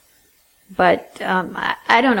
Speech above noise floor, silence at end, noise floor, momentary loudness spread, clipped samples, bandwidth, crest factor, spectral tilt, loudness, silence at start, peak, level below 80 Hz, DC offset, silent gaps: 39 dB; 0 s; -57 dBFS; 8 LU; under 0.1%; 17 kHz; 20 dB; -5.5 dB/octave; -18 LUFS; 0.7 s; 0 dBFS; -56 dBFS; under 0.1%; none